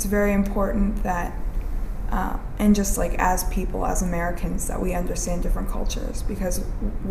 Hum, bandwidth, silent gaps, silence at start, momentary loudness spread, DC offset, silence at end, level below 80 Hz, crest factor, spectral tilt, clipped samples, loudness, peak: none; 16 kHz; none; 0 s; 10 LU; under 0.1%; 0 s; -26 dBFS; 16 dB; -5.5 dB/octave; under 0.1%; -25 LUFS; -6 dBFS